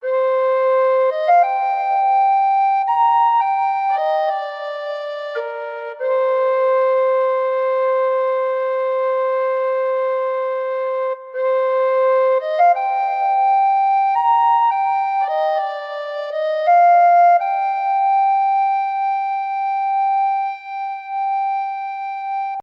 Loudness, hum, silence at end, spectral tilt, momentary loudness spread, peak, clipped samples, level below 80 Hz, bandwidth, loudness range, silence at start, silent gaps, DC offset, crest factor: -18 LUFS; none; 0 s; -0.5 dB/octave; 11 LU; -6 dBFS; under 0.1%; -82 dBFS; 5.8 kHz; 4 LU; 0 s; none; under 0.1%; 12 dB